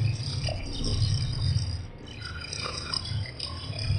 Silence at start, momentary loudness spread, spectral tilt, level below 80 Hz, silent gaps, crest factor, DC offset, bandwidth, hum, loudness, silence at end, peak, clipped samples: 0 s; 10 LU; -4.5 dB/octave; -38 dBFS; none; 16 dB; under 0.1%; 10.5 kHz; none; -31 LUFS; 0 s; -14 dBFS; under 0.1%